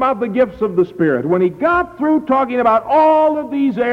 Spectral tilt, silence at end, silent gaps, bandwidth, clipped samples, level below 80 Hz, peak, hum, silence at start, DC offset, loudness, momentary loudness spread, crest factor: -8.5 dB/octave; 0 s; none; 6.2 kHz; under 0.1%; -48 dBFS; -4 dBFS; none; 0 s; under 0.1%; -15 LUFS; 5 LU; 10 dB